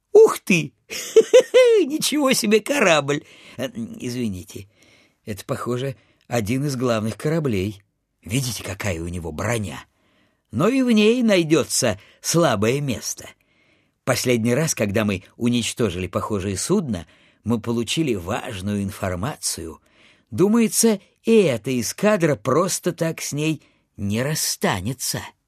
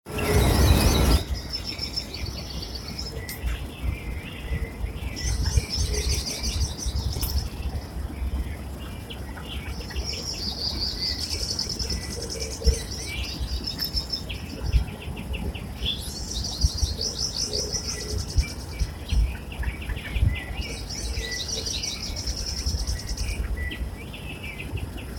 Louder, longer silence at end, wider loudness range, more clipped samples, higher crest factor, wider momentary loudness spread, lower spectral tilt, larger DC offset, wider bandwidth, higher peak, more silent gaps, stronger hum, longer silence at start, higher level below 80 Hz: first, -21 LUFS vs -28 LUFS; first, 0.2 s vs 0 s; first, 8 LU vs 4 LU; neither; about the same, 20 dB vs 22 dB; first, 14 LU vs 9 LU; about the same, -4.5 dB/octave vs -4 dB/octave; neither; second, 14 kHz vs 17 kHz; first, -2 dBFS vs -6 dBFS; neither; neither; about the same, 0.15 s vs 0.05 s; second, -54 dBFS vs -30 dBFS